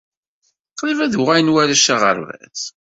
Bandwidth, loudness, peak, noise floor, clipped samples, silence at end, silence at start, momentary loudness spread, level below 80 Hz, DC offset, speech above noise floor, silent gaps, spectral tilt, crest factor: 8 kHz; -15 LUFS; -2 dBFS; -68 dBFS; under 0.1%; 0.3 s; 0.75 s; 15 LU; -60 dBFS; under 0.1%; 52 dB; none; -3 dB/octave; 16 dB